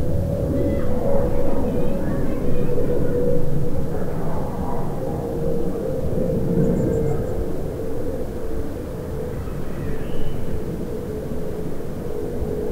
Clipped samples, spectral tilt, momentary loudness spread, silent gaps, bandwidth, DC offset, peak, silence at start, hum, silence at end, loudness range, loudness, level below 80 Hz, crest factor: under 0.1%; -8.5 dB/octave; 7 LU; none; 7.8 kHz; under 0.1%; -4 dBFS; 0 s; none; 0 s; 6 LU; -25 LUFS; -28 dBFS; 14 dB